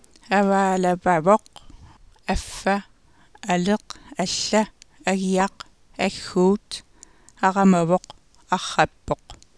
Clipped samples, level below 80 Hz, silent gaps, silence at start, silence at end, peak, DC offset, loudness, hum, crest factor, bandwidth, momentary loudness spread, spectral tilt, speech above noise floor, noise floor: under 0.1%; -46 dBFS; none; 0.3 s; 0.25 s; -2 dBFS; 0.1%; -22 LUFS; none; 20 dB; 11 kHz; 12 LU; -5 dB/octave; 34 dB; -55 dBFS